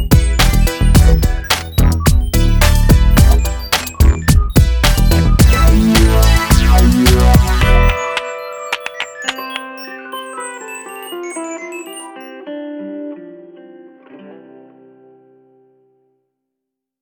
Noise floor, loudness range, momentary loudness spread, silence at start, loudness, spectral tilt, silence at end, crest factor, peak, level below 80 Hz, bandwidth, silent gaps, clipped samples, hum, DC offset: -79 dBFS; 19 LU; 17 LU; 0 s; -13 LUFS; -5 dB/octave; 2.7 s; 12 dB; 0 dBFS; -14 dBFS; 19.5 kHz; none; under 0.1%; none; under 0.1%